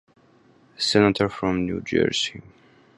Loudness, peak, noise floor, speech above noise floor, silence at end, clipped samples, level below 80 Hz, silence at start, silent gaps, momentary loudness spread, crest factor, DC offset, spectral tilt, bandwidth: -22 LUFS; -2 dBFS; -56 dBFS; 34 dB; 0.55 s; under 0.1%; -50 dBFS; 0.8 s; none; 7 LU; 22 dB; under 0.1%; -4.5 dB/octave; 11.5 kHz